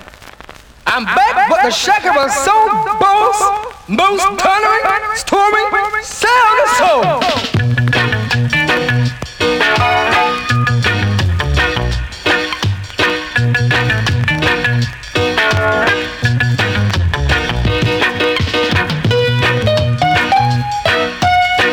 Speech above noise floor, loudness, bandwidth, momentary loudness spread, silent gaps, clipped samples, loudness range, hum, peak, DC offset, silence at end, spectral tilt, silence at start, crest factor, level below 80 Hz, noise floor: 25 dB; -13 LUFS; 18 kHz; 5 LU; none; under 0.1%; 2 LU; none; -2 dBFS; under 0.1%; 0 s; -4.5 dB/octave; 0 s; 10 dB; -30 dBFS; -37 dBFS